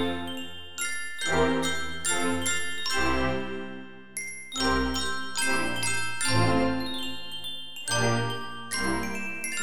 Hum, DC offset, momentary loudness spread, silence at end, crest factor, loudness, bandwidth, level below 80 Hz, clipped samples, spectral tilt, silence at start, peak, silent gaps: none; 2%; 11 LU; 0 s; 18 dB; -28 LUFS; 19 kHz; -46 dBFS; under 0.1%; -3 dB/octave; 0 s; -10 dBFS; none